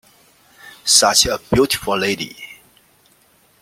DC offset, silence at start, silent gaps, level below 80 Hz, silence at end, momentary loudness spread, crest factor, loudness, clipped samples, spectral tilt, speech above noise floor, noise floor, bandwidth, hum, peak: under 0.1%; 0.65 s; none; -44 dBFS; 1.1 s; 19 LU; 20 dB; -15 LUFS; under 0.1%; -2 dB/octave; 39 dB; -55 dBFS; 16.5 kHz; none; 0 dBFS